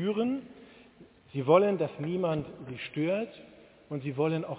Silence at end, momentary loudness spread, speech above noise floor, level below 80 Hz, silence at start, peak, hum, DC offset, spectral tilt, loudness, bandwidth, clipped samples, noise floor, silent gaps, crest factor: 0 s; 17 LU; 27 dB; -66 dBFS; 0 s; -8 dBFS; none; under 0.1%; -6.5 dB/octave; -30 LUFS; 4 kHz; under 0.1%; -56 dBFS; none; 22 dB